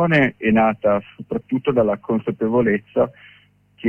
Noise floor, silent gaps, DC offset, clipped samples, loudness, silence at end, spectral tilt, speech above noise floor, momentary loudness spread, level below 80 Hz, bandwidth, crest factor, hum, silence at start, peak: -54 dBFS; none; under 0.1%; under 0.1%; -20 LUFS; 0 s; -9 dB/octave; 34 dB; 7 LU; -50 dBFS; 5.4 kHz; 14 dB; 50 Hz at -45 dBFS; 0 s; -4 dBFS